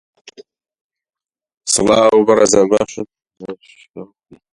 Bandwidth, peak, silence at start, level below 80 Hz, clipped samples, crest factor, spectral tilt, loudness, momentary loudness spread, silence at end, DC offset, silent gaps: 11.5 kHz; 0 dBFS; 0.4 s; -50 dBFS; under 0.1%; 18 dB; -3.5 dB/octave; -13 LUFS; 24 LU; 0.5 s; under 0.1%; 0.81-0.90 s, 1.57-1.61 s, 3.90-3.94 s